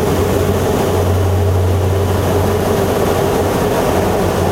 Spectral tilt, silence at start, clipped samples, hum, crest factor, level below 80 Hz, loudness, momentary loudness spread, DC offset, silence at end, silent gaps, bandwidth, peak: -6 dB/octave; 0 s; under 0.1%; none; 14 dB; -30 dBFS; -15 LUFS; 1 LU; under 0.1%; 0 s; none; 16 kHz; 0 dBFS